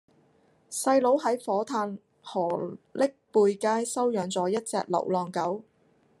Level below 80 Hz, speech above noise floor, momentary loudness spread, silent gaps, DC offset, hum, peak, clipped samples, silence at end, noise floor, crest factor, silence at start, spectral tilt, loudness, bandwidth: -78 dBFS; 38 dB; 11 LU; none; under 0.1%; none; -10 dBFS; under 0.1%; 0.6 s; -65 dBFS; 18 dB; 0.7 s; -4.5 dB/octave; -28 LUFS; 13 kHz